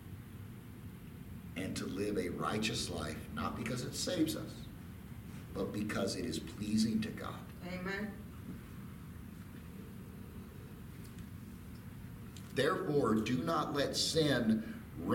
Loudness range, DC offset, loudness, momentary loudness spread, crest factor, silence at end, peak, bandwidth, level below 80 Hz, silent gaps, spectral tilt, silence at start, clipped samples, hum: 15 LU; under 0.1%; -36 LUFS; 17 LU; 20 dB; 0 s; -18 dBFS; 17 kHz; -56 dBFS; none; -5 dB/octave; 0 s; under 0.1%; none